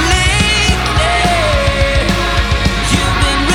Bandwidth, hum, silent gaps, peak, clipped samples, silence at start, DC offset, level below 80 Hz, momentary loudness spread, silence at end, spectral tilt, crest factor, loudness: 16.5 kHz; none; none; -2 dBFS; under 0.1%; 0 s; under 0.1%; -18 dBFS; 3 LU; 0 s; -4 dB/octave; 12 dB; -12 LUFS